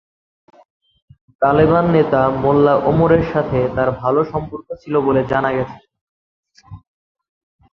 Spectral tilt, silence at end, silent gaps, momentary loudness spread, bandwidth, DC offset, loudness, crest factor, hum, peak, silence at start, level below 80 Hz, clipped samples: -9.5 dB/octave; 0.95 s; 6.01-6.43 s; 10 LU; 6.2 kHz; under 0.1%; -16 LUFS; 16 dB; none; -2 dBFS; 1.4 s; -42 dBFS; under 0.1%